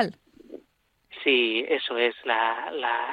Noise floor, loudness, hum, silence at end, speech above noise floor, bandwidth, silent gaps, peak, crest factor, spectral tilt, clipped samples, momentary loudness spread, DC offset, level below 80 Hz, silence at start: -67 dBFS; -25 LUFS; none; 0 s; 42 dB; 10.5 kHz; none; -8 dBFS; 20 dB; -5 dB/octave; under 0.1%; 7 LU; under 0.1%; -72 dBFS; 0 s